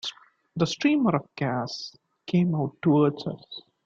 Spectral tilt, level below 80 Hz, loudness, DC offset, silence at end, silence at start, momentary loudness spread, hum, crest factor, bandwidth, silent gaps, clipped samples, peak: -6.5 dB/octave; -66 dBFS; -26 LUFS; under 0.1%; 0.25 s; 0.05 s; 18 LU; none; 18 dB; 7.6 kHz; none; under 0.1%; -8 dBFS